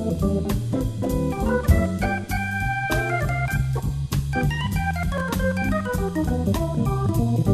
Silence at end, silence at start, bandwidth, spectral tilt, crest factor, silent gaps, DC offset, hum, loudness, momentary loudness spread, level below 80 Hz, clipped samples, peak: 0 s; 0 s; 14 kHz; -6.5 dB/octave; 18 dB; none; under 0.1%; none; -24 LUFS; 4 LU; -30 dBFS; under 0.1%; -6 dBFS